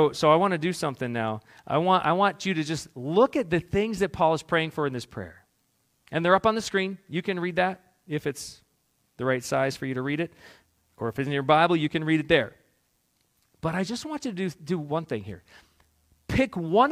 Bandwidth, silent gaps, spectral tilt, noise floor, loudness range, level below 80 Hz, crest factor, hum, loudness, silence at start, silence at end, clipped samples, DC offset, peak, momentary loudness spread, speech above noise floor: 15.5 kHz; none; -5.5 dB/octave; -71 dBFS; 6 LU; -54 dBFS; 22 dB; none; -26 LUFS; 0 s; 0 s; under 0.1%; under 0.1%; -6 dBFS; 13 LU; 45 dB